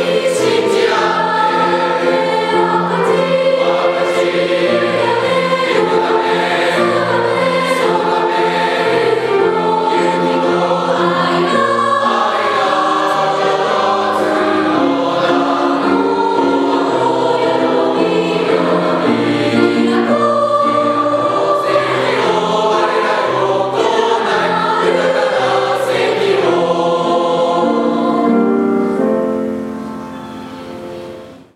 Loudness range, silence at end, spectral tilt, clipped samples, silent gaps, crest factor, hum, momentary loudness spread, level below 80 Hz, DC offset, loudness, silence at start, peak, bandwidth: 1 LU; 0.1 s; -5 dB/octave; under 0.1%; none; 14 dB; none; 2 LU; -58 dBFS; under 0.1%; -14 LUFS; 0 s; 0 dBFS; 13.5 kHz